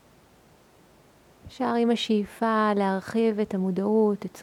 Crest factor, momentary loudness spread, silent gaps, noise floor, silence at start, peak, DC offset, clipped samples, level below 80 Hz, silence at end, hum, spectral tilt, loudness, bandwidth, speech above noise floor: 16 dB; 4 LU; none; -57 dBFS; 1.45 s; -10 dBFS; under 0.1%; under 0.1%; -64 dBFS; 0 s; none; -6.5 dB/octave; -25 LUFS; 13 kHz; 32 dB